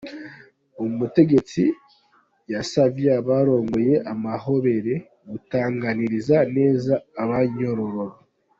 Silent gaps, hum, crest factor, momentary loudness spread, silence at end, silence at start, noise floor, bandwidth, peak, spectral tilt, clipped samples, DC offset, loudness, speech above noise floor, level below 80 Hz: none; none; 18 dB; 12 LU; 0.5 s; 0 s; -61 dBFS; 7.8 kHz; -4 dBFS; -7.5 dB/octave; under 0.1%; under 0.1%; -22 LUFS; 41 dB; -58 dBFS